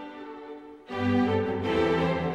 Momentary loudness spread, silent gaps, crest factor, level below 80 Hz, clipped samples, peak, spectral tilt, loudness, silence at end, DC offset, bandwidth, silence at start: 18 LU; none; 14 dB; -52 dBFS; under 0.1%; -14 dBFS; -7.5 dB/octave; -26 LUFS; 0 s; under 0.1%; 8.8 kHz; 0 s